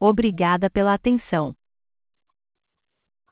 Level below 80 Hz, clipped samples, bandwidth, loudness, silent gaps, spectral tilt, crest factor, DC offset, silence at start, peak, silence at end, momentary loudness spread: -48 dBFS; under 0.1%; 4 kHz; -21 LUFS; none; -11 dB/octave; 16 dB; under 0.1%; 0 s; -6 dBFS; 1.8 s; 6 LU